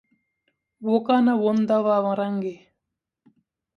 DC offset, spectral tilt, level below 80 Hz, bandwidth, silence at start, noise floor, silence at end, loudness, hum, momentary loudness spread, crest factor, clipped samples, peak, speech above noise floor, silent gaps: under 0.1%; -8 dB/octave; -74 dBFS; 6.6 kHz; 0.8 s; -83 dBFS; 1.2 s; -22 LUFS; none; 11 LU; 18 dB; under 0.1%; -6 dBFS; 62 dB; none